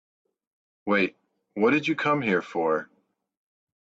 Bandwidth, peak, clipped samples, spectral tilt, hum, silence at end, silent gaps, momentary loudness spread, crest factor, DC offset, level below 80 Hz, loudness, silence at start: 7.8 kHz; -10 dBFS; under 0.1%; -6.5 dB/octave; none; 1 s; none; 7 LU; 18 dB; under 0.1%; -72 dBFS; -25 LUFS; 0.85 s